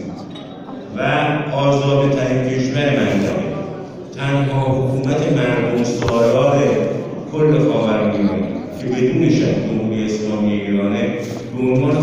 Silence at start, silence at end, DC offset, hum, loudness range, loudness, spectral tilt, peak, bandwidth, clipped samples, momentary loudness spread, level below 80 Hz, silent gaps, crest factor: 0 s; 0 s; under 0.1%; none; 2 LU; -17 LUFS; -7 dB/octave; -4 dBFS; 9 kHz; under 0.1%; 11 LU; -46 dBFS; none; 14 dB